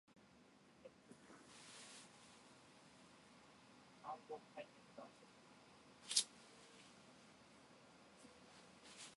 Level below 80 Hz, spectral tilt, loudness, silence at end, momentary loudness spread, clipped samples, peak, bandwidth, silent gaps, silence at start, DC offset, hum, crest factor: -88 dBFS; -0.5 dB/octave; -48 LUFS; 0 s; 13 LU; under 0.1%; -20 dBFS; 11.5 kHz; none; 0.05 s; under 0.1%; none; 36 dB